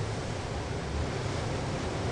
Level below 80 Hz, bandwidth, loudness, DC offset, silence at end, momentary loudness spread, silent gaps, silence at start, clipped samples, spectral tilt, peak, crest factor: -42 dBFS; 11.5 kHz; -34 LUFS; under 0.1%; 0 s; 2 LU; none; 0 s; under 0.1%; -5.5 dB/octave; -20 dBFS; 12 dB